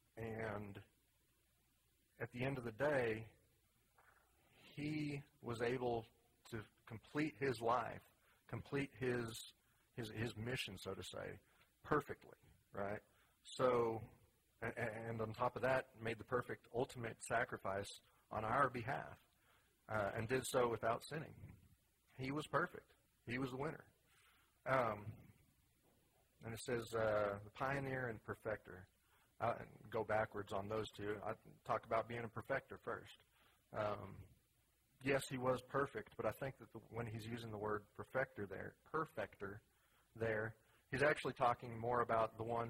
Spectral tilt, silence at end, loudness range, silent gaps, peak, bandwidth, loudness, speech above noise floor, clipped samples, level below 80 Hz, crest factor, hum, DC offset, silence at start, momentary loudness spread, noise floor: -5.5 dB/octave; 0 s; 4 LU; none; -20 dBFS; 16 kHz; -44 LUFS; 36 dB; under 0.1%; -70 dBFS; 24 dB; none; under 0.1%; 0.15 s; 15 LU; -79 dBFS